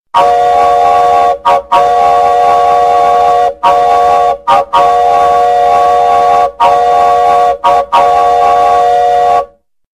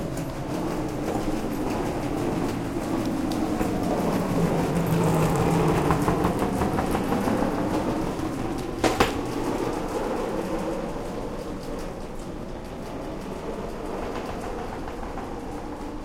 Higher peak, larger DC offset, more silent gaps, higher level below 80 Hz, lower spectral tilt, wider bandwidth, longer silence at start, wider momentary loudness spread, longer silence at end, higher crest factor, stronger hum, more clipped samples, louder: first, 0 dBFS vs -4 dBFS; first, 0.2% vs under 0.1%; neither; about the same, -40 dBFS vs -38 dBFS; second, -3.5 dB/octave vs -6.5 dB/octave; second, 12.5 kHz vs 16.5 kHz; first, 0.15 s vs 0 s; second, 2 LU vs 12 LU; first, 0.5 s vs 0 s; second, 8 dB vs 22 dB; neither; neither; first, -8 LUFS vs -27 LUFS